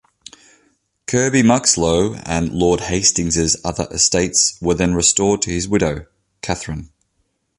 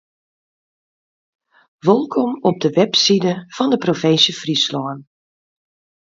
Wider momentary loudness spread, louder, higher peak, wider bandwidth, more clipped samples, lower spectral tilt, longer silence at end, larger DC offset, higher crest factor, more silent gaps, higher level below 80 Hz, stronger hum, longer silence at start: first, 11 LU vs 8 LU; about the same, -16 LUFS vs -16 LUFS; about the same, 0 dBFS vs 0 dBFS; first, 11.5 kHz vs 7.8 kHz; neither; about the same, -3.5 dB/octave vs -4.5 dB/octave; second, 0.7 s vs 1.15 s; neither; about the same, 18 dB vs 20 dB; neither; first, -38 dBFS vs -66 dBFS; neither; second, 1.1 s vs 1.85 s